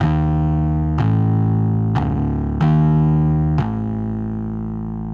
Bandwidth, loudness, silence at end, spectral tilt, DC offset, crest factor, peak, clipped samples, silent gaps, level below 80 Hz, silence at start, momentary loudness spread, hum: 4.4 kHz; -18 LUFS; 0 s; -10.5 dB/octave; under 0.1%; 12 dB; -4 dBFS; under 0.1%; none; -28 dBFS; 0 s; 9 LU; none